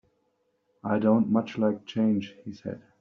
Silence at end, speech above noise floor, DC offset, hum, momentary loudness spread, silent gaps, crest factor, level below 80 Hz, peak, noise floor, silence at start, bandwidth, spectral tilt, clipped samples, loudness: 0.25 s; 47 dB; under 0.1%; none; 16 LU; none; 18 dB; -68 dBFS; -10 dBFS; -73 dBFS; 0.85 s; 6.4 kHz; -7 dB/octave; under 0.1%; -26 LUFS